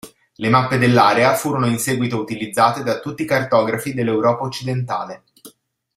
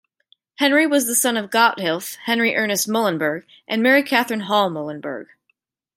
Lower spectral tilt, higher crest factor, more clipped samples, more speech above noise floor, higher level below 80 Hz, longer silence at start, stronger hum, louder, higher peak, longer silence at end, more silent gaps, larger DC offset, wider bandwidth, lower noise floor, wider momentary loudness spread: first, -5.5 dB/octave vs -2.5 dB/octave; about the same, 18 dB vs 18 dB; neither; second, 32 dB vs 50 dB; first, -56 dBFS vs -74 dBFS; second, 0.05 s vs 0.6 s; neither; about the same, -18 LUFS vs -19 LUFS; about the same, 0 dBFS vs -2 dBFS; second, 0.45 s vs 0.75 s; neither; neither; about the same, 16 kHz vs 16.5 kHz; second, -50 dBFS vs -70 dBFS; about the same, 11 LU vs 12 LU